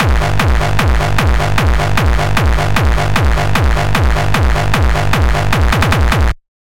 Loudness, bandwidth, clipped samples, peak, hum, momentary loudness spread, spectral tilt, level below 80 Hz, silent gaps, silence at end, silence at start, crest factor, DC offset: -14 LUFS; 17 kHz; under 0.1%; 0 dBFS; none; 1 LU; -5.5 dB/octave; -16 dBFS; none; 0.2 s; 0 s; 10 dB; 9%